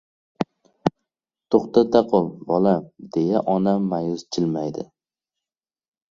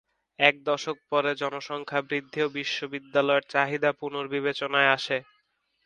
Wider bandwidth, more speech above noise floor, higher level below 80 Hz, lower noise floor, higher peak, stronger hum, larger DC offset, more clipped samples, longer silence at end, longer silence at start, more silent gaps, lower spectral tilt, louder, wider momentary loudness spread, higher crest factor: second, 7.6 kHz vs 9.8 kHz; first, over 70 dB vs 45 dB; first, -62 dBFS vs -76 dBFS; first, under -90 dBFS vs -72 dBFS; about the same, -2 dBFS vs -2 dBFS; neither; neither; neither; first, 1.25 s vs 0.65 s; about the same, 0.4 s vs 0.4 s; neither; first, -7.5 dB/octave vs -4 dB/octave; first, -22 LUFS vs -26 LUFS; first, 12 LU vs 9 LU; about the same, 22 dB vs 26 dB